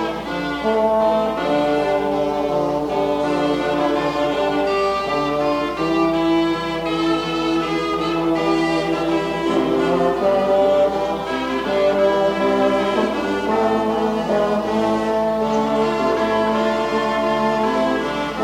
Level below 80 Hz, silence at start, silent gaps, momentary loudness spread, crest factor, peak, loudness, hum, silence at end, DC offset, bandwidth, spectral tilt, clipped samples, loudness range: -46 dBFS; 0 s; none; 4 LU; 14 dB; -6 dBFS; -19 LUFS; 60 Hz at -45 dBFS; 0 s; under 0.1%; 16 kHz; -5.5 dB/octave; under 0.1%; 2 LU